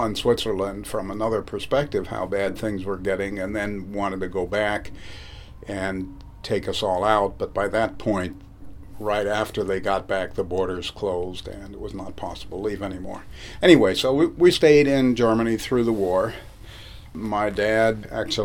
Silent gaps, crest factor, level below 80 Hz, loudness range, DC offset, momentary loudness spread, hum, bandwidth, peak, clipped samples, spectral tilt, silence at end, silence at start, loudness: none; 22 dB; -44 dBFS; 9 LU; under 0.1%; 19 LU; none; 17 kHz; 0 dBFS; under 0.1%; -5.5 dB/octave; 0 s; 0 s; -23 LUFS